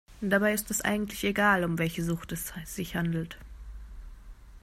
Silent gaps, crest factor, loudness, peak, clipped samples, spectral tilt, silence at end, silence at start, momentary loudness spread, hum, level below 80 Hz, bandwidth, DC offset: none; 20 dB; -29 LUFS; -10 dBFS; under 0.1%; -4.5 dB/octave; 0.05 s; 0.1 s; 23 LU; none; -48 dBFS; 16 kHz; under 0.1%